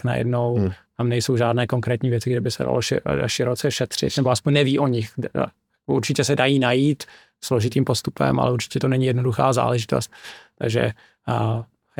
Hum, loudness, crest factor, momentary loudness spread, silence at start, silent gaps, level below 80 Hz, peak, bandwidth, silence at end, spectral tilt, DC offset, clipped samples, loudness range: none; -22 LUFS; 18 dB; 9 LU; 0.05 s; none; -52 dBFS; -4 dBFS; 17 kHz; 0.35 s; -5.5 dB/octave; under 0.1%; under 0.1%; 1 LU